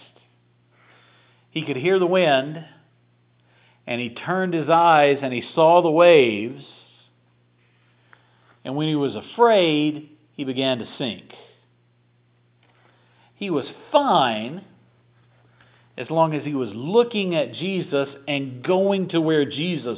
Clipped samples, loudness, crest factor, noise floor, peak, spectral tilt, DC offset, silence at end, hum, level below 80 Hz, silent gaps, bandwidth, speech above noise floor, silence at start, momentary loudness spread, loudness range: under 0.1%; -20 LUFS; 20 dB; -61 dBFS; -2 dBFS; -10 dB/octave; under 0.1%; 0 s; 60 Hz at -55 dBFS; -72 dBFS; none; 4 kHz; 41 dB; 1.55 s; 17 LU; 10 LU